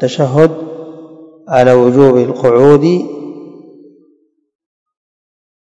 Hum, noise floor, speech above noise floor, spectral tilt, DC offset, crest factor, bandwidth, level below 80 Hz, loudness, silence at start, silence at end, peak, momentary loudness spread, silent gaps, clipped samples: none; -55 dBFS; 46 dB; -7.5 dB/octave; under 0.1%; 12 dB; 8.6 kHz; -52 dBFS; -9 LUFS; 0 s; 2.2 s; 0 dBFS; 22 LU; none; 1%